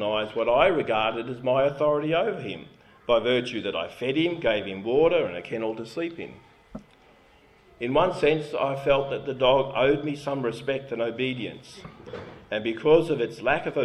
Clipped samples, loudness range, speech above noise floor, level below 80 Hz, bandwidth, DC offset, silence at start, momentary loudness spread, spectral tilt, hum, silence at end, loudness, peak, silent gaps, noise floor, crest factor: under 0.1%; 4 LU; 31 dB; -54 dBFS; 11.5 kHz; under 0.1%; 0 s; 19 LU; -6 dB/octave; none; 0 s; -25 LUFS; -6 dBFS; none; -56 dBFS; 20 dB